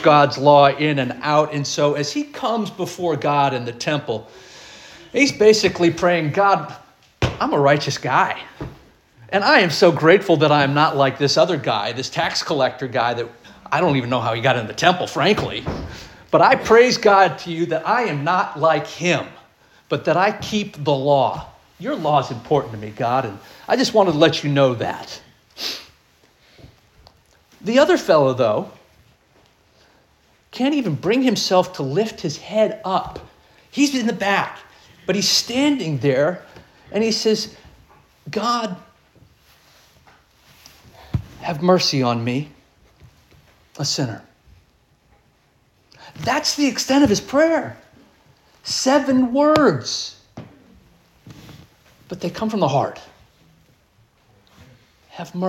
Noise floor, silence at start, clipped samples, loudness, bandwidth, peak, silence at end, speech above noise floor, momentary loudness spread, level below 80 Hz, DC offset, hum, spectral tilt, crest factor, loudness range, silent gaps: -59 dBFS; 0 s; under 0.1%; -18 LUFS; 17 kHz; 0 dBFS; 0 s; 41 dB; 16 LU; -50 dBFS; under 0.1%; none; -4.5 dB/octave; 20 dB; 10 LU; none